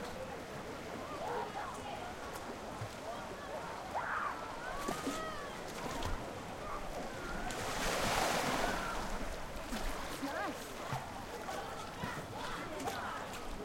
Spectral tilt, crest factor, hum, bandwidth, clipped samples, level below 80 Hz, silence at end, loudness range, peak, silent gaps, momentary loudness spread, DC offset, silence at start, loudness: -3.5 dB/octave; 20 dB; none; 16 kHz; under 0.1%; -50 dBFS; 0 s; 5 LU; -20 dBFS; none; 9 LU; under 0.1%; 0 s; -40 LUFS